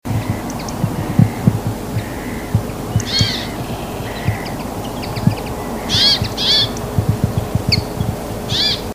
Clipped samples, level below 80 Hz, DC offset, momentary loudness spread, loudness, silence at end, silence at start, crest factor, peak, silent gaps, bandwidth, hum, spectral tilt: under 0.1%; -32 dBFS; under 0.1%; 12 LU; -18 LUFS; 0 s; 0.05 s; 18 dB; 0 dBFS; none; 16 kHz; none; -5 dB/octave